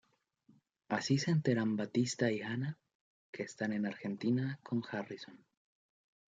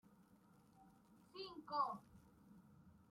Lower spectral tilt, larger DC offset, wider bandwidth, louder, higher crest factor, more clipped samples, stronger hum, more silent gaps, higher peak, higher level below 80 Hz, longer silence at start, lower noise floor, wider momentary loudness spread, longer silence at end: about the same, -6 dB/octave vs -5.5 dB/octave; neither; second, 9.4 kHz vs 16 kHz; first, -36 LUFS vs -46 LUFS; about the same, 18 dB vs 22 dB; neither; neither; first, 2.95-3.33 s vs none; first, -18 dBFS vs -28 dBFS; about the same, -78 dBFS vs -82 dBFS; first, 0.9 s vs 0.05 s; about the same, -71 dBFS vs -70 dBFS; second, 14 LU vs 26 LU; first, 0.95 s vs 0.1 s